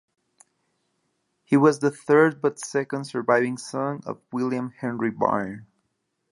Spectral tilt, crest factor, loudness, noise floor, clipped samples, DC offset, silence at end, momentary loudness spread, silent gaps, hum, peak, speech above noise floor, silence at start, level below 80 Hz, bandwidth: -6 dB/octave; 20 dB; -24 LUFS; -76 dBFS; under 0.1%; under 0.1%; 0.65 s; 11 LU; none; none; -4 dBFS; 53 dB; 1.5 s; -70 dBFS; 11.5 kHz